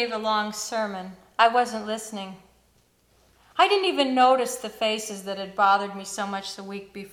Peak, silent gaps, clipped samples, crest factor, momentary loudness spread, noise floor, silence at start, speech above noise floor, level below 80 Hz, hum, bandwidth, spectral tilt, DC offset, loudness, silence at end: -2 dBFS; none; under 0.1%; 24 dB; 16 LU; -63 dBFS; 0 s; 39 dB; -66 dBFS; none; 17.5 kHz; -2.5 dB/octave; under 0.1%; -24 LUFS; 0.05 s